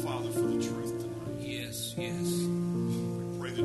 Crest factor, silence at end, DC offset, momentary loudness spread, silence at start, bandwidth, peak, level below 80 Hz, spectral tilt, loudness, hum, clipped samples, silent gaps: 12 dB; 0 s; under 0.1%; 6 LU; 0 s; 12.5 kHz; -20 dBFS; -60 dBFS; -5.5 dB/octave; -33 LUFS; none; under 0.1%; none